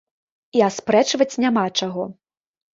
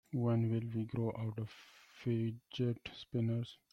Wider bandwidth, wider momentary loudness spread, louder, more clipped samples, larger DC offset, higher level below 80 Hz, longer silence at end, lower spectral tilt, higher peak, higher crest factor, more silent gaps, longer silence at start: first, 7.8 kHz vs 6.4 kHz; about the same, 10 LU vs 11 LU; first, -20 LUFS vs -38 LUFS; neither; neither; first, -64 dBFS vs -70 dBFS; first, 0.6 s vs 0.15 s; second, -4 dB/octave vs -8.5 dB/octave; first, -2 dBFS vs -24 dBFS; about the same, 18 dB vs 14 dB; neither; first, 0.55 s vs 0.1 s